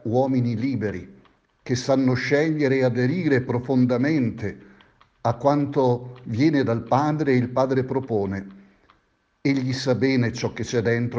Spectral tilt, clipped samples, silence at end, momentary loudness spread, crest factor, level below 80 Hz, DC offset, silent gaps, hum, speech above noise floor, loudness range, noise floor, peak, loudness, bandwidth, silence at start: -7 dB/octave; under 0.1%; 0 s; 8 LU; 18 dB; -58 dBFS; under 0.1%; none; none; 45 dB; 3 LU; -66 dBFS; -4 dBFS; -23 LUFS; 7.6 kHz; 0.05 s